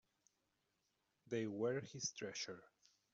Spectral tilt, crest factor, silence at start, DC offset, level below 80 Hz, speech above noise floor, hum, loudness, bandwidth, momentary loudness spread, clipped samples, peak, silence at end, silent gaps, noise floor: -4.5 dB/octave; 18 dB; 1.3 s; under 0.1%; -86 dBFS; 41 dB; none; -45 LUFS; 8 kHz; 7 LU; under 0.1%; -30 dBFS; 0.45 s; none; -86 dBFS